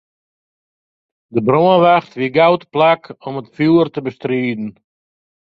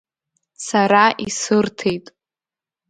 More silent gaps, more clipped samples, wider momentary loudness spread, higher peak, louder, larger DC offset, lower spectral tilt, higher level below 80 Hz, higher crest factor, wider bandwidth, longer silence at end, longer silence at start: neither; neither; first, 15 LU vs 12 LU; about the same, 0 dBFS vs 0 dBFS; about the same, -15 LUFS vs -17 LUFS; neither; first, -8.5 dB/octave vs -4 dB/octave; about the same, -60 dBFS vs -60 dBFS; about the same, 16 dB vs 20 dB; second, 6 kHz vs 9.4 kHz; about the same, 0.9 s vs 0.9 s; first, 1.35 s vs 0.6 s